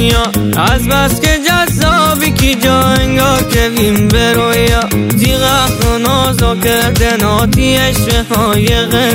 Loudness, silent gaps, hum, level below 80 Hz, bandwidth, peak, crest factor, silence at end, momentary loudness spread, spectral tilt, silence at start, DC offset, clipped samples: -10 LUFS; none; none; -20 dBFS; 16.5 kHz; 0 dBFS; 10 dB; 0 s; 2 LU; -4.5 dB/octave; 0 s; under 0.1%; under 0.1%